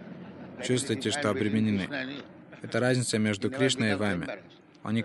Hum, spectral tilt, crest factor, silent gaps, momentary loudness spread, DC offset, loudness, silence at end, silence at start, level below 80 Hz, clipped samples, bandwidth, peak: none; -4.5 dB/octave; 18 dB; none; 17 LU; under 0.1%; -28 LUFS; 0 s; 0 s; -66 dBFS; under 0.1%; 11.5 kHz; -12 dBFS